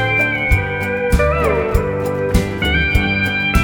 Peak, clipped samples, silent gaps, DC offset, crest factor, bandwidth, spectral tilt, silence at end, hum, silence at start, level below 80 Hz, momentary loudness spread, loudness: 0 dBFS; under 0.1%; none; under 0.1%; 16 dB; over 20 kHz; -6 dB/octave; 0 s; none; 0 s; -22 dBFS; 4 LU; -16 LUFS